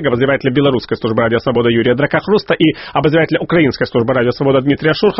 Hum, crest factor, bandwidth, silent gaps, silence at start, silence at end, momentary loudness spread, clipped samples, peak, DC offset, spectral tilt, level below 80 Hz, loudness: none; 14 dB; 6 kHz; none; 0 s; 0 s; 2 LU; under 0.1%; 0 dBFS; under 0.1%; -5 dB/octave; -44 dBFS; -14 LUFS